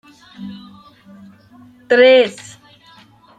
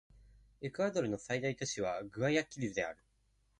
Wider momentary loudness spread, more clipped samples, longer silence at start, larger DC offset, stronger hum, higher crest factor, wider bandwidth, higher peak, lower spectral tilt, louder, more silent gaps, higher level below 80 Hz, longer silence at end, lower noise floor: first, 26 LU vs 10 LU; neither; second, 0.4 s vs 0.6 s; neither; neither; about the same, 16 dB vs 20 dB; second, 9.4 kHz vs 11 kHz; first, -2 dBFS vs -18 dBFS; about the same, -4 dB/octave vs -4.5 dB/octave; first, -12 LUFS vs -37 LUFS; neither; about the same, -66 dBFS vs -66 dBFS; first, 1.05 s vs 0.65 s; second, -47 dBFS vs -74 dBFS